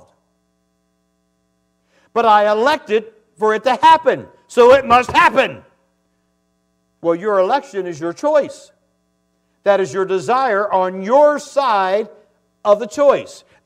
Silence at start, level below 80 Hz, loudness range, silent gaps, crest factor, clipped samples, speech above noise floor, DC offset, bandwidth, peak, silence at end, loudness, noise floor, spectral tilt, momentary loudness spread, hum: 2.15 s; -58 dBFS; 7 LU; none; 16 dB; under 0.1%; 51 dB; under 0.1%; 13 kHz; 0 dBFS; 0.3 s; -15 LUFS; -65 dBFS; -4.5 dB/octave; 12 LU; none